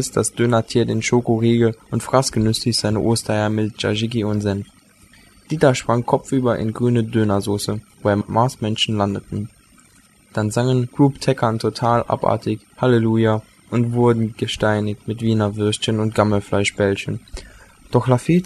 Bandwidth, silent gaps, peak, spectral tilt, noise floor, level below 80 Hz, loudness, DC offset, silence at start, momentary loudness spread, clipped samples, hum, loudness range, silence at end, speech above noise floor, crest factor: 13 kHz; none; -2 dBFS; -6 dB/octave; -52 dBFS; -46 dBFS; -19 LUFS; under 0.1%; 0 s; 8 LU; under 0.1%; none; 2 LU; 0 s; 34 dB; 18 dB